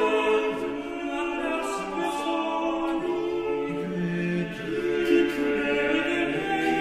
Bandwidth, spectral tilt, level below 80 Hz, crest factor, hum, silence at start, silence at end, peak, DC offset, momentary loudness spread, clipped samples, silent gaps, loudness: 14 kHz; -5.5 dB/octave; -54 dBFS; 16 dB; none; 0 s; 0 s; -10 dBFS; under 0.1%; 7 LU; under 0.1%; none; -26 LUFS